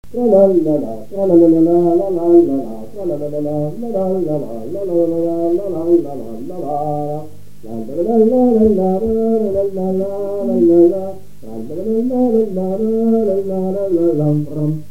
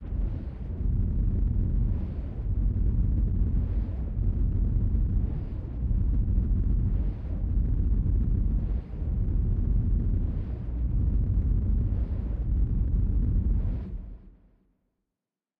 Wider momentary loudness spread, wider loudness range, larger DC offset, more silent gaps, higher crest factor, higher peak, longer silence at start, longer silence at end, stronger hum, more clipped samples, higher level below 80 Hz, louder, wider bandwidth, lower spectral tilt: first, 14 LU vs 6 LU; first, 5 LU vs 1 LU; first, 4% vs under 0.1%; neither; about the same, 16 dB vs 12 dB; first, 0 dBFS vs -14 dBFS; first, 0.15 s vs 0 s; second, 0.1 s vs 1.3 s; first, 50 Hz at -45 dBFS vs none; neither; second, -46 dBFS vs -28 dBFS; first, -15 LUFS vs -29 LUFS; first, 3.8 kHz vs 2.1 kHz; second, -10.5 dB/octave vs -12.5 dB/octave